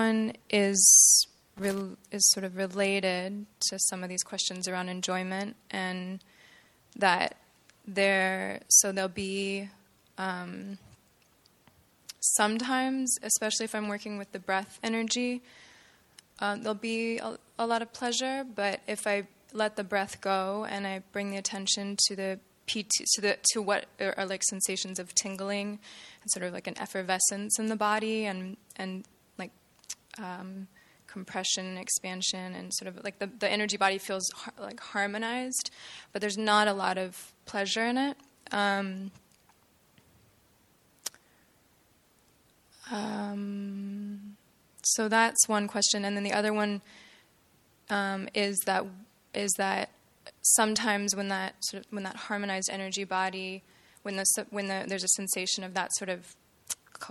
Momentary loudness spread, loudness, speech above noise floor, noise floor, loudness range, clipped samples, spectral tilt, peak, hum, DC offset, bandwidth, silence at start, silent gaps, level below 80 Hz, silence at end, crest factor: 16 LU; -28 LUFS; 35 dB; -65 dBFS; 8 LU; under 0.1%; -1.5 dB/octave; -8 dBFS; none; under 0.1%; 15 kHz; 0 s; none; -74 dBFS; 0 s; 24 dB